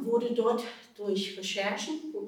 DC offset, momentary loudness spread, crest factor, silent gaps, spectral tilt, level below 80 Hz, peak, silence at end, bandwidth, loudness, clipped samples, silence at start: under 0.1%; 8 LU; 16 dB; none; -4 dB/octave; -88 dBFS; -16 dBFS; 0 s; 16.5 kHz; -31 LUFS; under 0.1%; 0 s